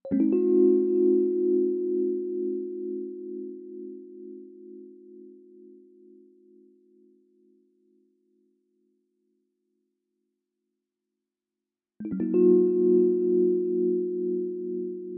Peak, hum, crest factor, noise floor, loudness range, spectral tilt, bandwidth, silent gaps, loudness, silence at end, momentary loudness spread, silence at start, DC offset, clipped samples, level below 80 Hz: -10 dBFS; none; 18 dB; -89 dBFS; 22 LU; -14.5 dB/octave; 2.8 kHz; none; -25 LUFS; 0 s; 23 LU; 0.05 s; under 0.1%; under 0.1%; -78 dBFS